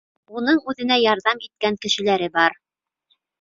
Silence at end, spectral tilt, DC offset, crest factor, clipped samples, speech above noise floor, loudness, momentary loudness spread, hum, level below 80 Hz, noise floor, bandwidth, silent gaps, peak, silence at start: 0.9 s; -3.5 dB/octave; under 0.1%; 20 dB; under 0.1%; 49 dB; -20 LUFS; 7 LU; none; -64 dBFS; -69 dBFS; 7.8 kHz; none; -2 dBFS; 0.3 s